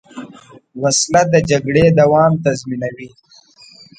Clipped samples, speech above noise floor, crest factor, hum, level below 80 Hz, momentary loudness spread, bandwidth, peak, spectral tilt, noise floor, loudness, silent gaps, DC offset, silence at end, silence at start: under 0.1%; 31 dB; 16 dB; none; -44 dBFS; 18 LU; 9.4 kHz; 0 dBFS; -5 dB/octave; -45 dBFS; -14 LUFS; none; under 0.1%; 0.9 s; 0.15 s